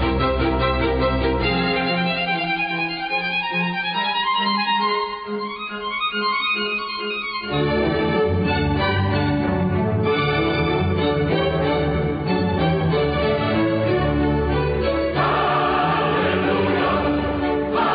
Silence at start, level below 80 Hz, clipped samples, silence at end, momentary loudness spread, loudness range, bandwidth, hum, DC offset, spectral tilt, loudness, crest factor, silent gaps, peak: 0 s; -34 dBFS; under 0.1%; 0 s; 3 LU; 2 LU; 5.2 kHz; none; under 0.1%; -11 dB/octave; -20 LUFS; 12 dB; none; -8 dBFS